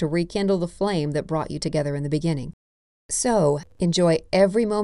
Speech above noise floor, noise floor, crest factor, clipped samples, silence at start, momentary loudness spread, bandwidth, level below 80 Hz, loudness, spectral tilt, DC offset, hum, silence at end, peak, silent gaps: over 68 dB; under -90 dBFS; 16 dB; under 0.1%; 0 s; 7 LU; 11.5 kHz; -46 dBFS; -23 LUFS; -5.5 dB/octave; under 0.1%; none; 0 s; -6 dBFS; 2.53-3.09 s